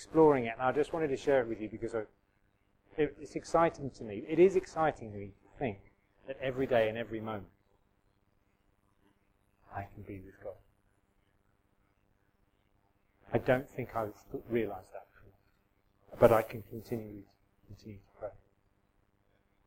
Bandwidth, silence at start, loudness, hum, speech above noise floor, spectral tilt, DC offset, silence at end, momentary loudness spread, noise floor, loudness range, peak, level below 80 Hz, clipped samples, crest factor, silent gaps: 16.5 kHz; 0 s; -32 LUFS; none; 41 dB; -7 dB/octave; under 0.1%; 1.35 s; 22 LU; -73 dBFS; 18 LU; -8 dBFS; -60 dBFS; under 0.1%; 28 dB; none